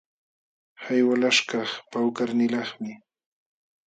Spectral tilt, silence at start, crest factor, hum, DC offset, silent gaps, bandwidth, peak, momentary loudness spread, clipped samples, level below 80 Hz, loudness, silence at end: -3.5 dB/octave; 0.8 s; 20 dB; none; under 0.1%; none; 9.2 kHz; -6 dBFS; 15 LU; under 0.1%; -78 dBFS; -24 LUFS; 0.9 s